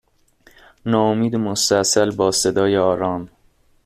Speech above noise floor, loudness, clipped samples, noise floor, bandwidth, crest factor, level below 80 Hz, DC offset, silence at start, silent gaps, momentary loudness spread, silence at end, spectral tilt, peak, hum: 39 dB; -18 LUFS; under 0.1%; -57 dBFS; 15.5 kHz; 16 dB; -54 dBFS; under 0.1%; 0.85 s; none; 7 LU; 0.6 s; -4 dB/octave; -2 dBFS; none